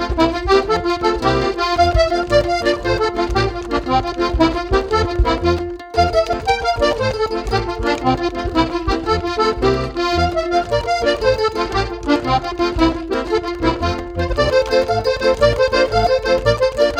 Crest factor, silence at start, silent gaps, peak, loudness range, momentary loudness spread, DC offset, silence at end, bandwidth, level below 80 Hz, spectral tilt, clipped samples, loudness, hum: 16 dB; 0 s; none; 0 dBFS; 2 LU; 5 LU; under 0.1%; 0 s; 13.5 kHz; -28 dBFS; -5.5 dB/octave; under 0.1%; -17 LUFS; none